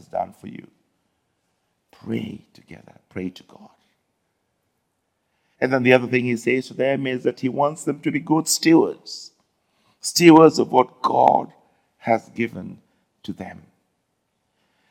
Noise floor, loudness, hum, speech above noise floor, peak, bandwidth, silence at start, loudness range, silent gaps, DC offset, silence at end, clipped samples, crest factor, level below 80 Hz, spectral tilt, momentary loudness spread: -73 dBFS; -19 LUFS; none; 53 dB; 0 dBFS; 16.5 kHz; 0.15 s; 18 LU; none; under 0.1%; 1.4 s; under 0.1%; 22 dB; -68 dBFS; -4.5 dB/octave; 22 LU